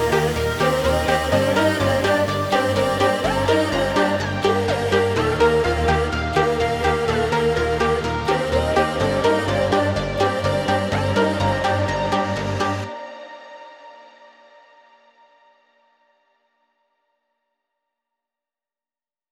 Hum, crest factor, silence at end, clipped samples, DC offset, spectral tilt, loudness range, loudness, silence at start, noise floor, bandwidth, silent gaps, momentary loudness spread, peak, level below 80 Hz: none; 16 dB; 5.3 s; under 0.1%; under 0.1%; -5.5 dB/octave; 6 LU; -20 LUFS; 0 s; under -90 dBFS; 19 kHz; none; 4 LU; -4 dBFS; -36 dBFS